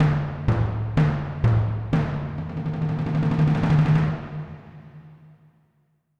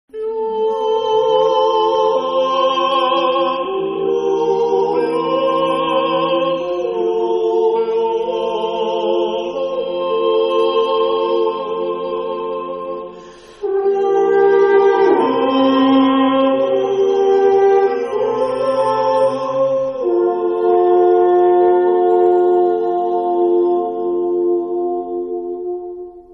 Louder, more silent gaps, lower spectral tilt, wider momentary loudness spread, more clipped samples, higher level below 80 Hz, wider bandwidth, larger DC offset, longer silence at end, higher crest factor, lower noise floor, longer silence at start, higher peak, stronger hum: second, -23 LUFS vs -16 LUFS; neither; first, -9 dB/octave vs -6 dB/octave; first, 13 LU vs 9 LU; neither; first, -38 dBFS vs -58 dBFS; second, 6 kHz vs 9.4 kHz; neither; first, 1.05 s vs 0 s; about the same, 16 dB vs 12 dB; first, -67 dBFS vs -38 dBFS; second, 0 s vs 0.15 s; second, -8 dBFS vs -4 dBFS; neither